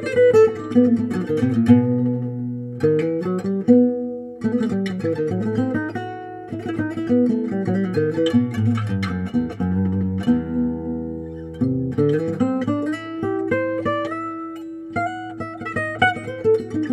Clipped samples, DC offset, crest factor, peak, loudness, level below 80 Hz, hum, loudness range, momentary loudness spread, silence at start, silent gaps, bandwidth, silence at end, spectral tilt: under 0.1%; under 0.1%; 20 dB; 0 dBFS; -21 LUFS; -50 dBFS; none; 5 LU; 13 LU; 0 s; none; 11 kHz; 0 s; -8 dB/octave